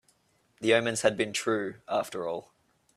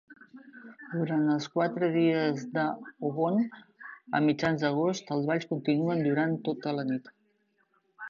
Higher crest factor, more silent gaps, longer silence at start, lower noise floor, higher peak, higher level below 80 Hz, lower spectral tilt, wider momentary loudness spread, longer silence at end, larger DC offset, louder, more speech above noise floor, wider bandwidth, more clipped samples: about the same, 22 dB vs 18 dB; neither; first, 0.6 s vs 0.1 s; about the same, -69 dBFS vs -72 dBFS; first, -8 dBFS vs -12 dBFS; about the same, -72 dBFS vs -72 dBFS; second, -3.5 dB/octave vs -7 dB/octave; about the same, 10 LU vs 11 LU; first, 0.55 s vs 0 s; neither; about the same, -29 LUFS vs -29 LUFS; about the same, 40 dB vs 43 dB; first, 14.5 kHz vs 7.2 kHz; neither